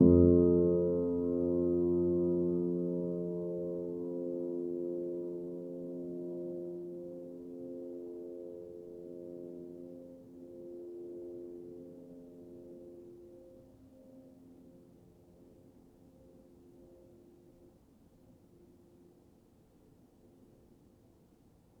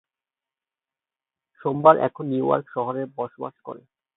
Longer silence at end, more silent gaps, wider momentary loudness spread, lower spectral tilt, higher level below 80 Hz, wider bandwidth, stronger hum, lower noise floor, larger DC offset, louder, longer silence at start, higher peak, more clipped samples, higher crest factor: first, 4.85 s vs 0.4 s; neither; about the same, 22 LU vs 21 LU; about the same, -12.5 dB/octave vs -11.5 dB/octave; first, -58 dBFS vs -74 dBFS; second, 1.5 kHz vs 4 kHz; neither; second, -64 dBFS vs under -90 dBFS; neither; second, -34 LUFS vs -22 LUFS; second, 0 s vs 1.6 s; second, -12 dBFS vs 0 dBFS; neither; about the same, 24 dB vs 24 dB